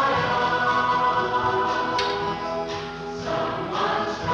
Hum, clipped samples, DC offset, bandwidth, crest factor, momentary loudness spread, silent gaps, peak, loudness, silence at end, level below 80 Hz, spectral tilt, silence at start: none; under 0.1%; under 0.1%; 10.5 kHz; 12 dB; 8 LU; none; -10 dBFS; -24 LUFS; 0 s; -50 dBFS; -4.5 dB/octave; 0 s